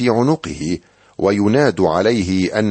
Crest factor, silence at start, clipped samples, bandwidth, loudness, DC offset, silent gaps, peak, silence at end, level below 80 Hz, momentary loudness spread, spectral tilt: 14 dB; 0 s; under 0.1%; 8.8 kHz; -17 LUFS; under 0.1%; none; -2 dBFS; 0 s; -46 dBFS; 9 LU; -6.5 dB/octave